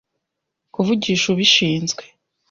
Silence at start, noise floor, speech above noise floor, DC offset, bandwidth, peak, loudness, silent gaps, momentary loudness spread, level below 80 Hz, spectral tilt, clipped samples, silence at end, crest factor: 0.8 s; -79 dBFS; 61 dB; under 0.1%; 7.4 kHz; -2 dBFS; -17 LUFS; none; 14 LU; -58 dBFS; -3.5 dB/octave; under 0.1%; 0.45 s; 18 dB